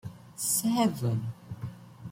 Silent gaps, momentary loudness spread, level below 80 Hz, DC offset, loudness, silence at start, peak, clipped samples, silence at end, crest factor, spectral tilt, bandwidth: none; 17 LU; -64 dBFS; under 0.1%; -29 LUFS; 0.05 s; -12 dBFS; under 0.1%; 0 s; 18 dB; -5 dB/octave; 16.5 kHz